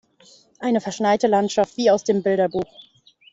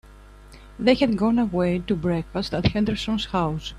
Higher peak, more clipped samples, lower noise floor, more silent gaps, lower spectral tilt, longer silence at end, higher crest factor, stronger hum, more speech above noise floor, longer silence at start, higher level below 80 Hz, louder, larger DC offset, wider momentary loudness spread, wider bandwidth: about the same, -6 dBFS vs -6 dBFS; neither; first, -53 dBFS vs -46 dBFS; neither; second, -5 dB/octave vs -7 dB/octave; first, 0.7 s vs 0 s; about the same, 16 dB vs 18 dB; second, none vs 50 Hz at -40 dBFS; first, 33 dB vs 23 dB; first, 0.6 s vs 0.05 s; second, -62 dBFS vs -42 dBFS; first, -20 LUFS vs -23 LUFS; neither; first, 9 LU vs 6 LU; second, 8 kHz vs 11.5 kHz